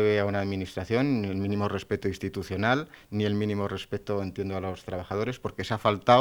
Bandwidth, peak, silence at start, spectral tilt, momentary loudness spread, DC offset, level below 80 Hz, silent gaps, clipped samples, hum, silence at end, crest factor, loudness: 19 kHz; -4 dBFS; 0 s; -6.5 dB/octave; 8 LU; under 0.1%; -56 dBFS; none; under 0.1%; none; 0 s; 24 dB; -29 LUFS